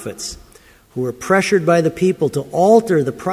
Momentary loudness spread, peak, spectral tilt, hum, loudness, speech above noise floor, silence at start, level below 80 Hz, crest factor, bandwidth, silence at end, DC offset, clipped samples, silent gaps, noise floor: 15 LU; 0 dBFS; -5.5 dB/octave; none; -16 LUFS; 31 dB; 0 s; -50 dBFS; 16 dB; 16 kHz; 0 s; under 0.1%; under 0.1%; none; -47 dBFS